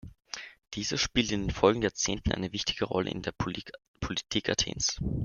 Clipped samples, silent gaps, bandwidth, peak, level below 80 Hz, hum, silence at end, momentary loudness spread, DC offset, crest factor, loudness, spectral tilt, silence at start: under 0.1%; 3.88-3.94 s; 10.5 kHz; -6 dBFS; -46 dBFS; none; 0 s; 15 LU; under 0.1%; 24 dB; -30 LUFS; -3.5 dB/octave; 0.05 s